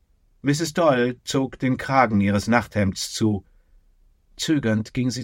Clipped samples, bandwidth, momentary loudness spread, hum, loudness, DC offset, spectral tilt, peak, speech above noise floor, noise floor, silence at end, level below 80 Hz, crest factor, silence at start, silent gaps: under 0.1%; 16.5 kHz; 6 LU; none; -22 LUFS; under 0.1%; -5.5 dB/octave; -4 dBFS; 36 dB; -58 dBFS; 0 s; -52 dBFS; 20 dB; 0.45 s; none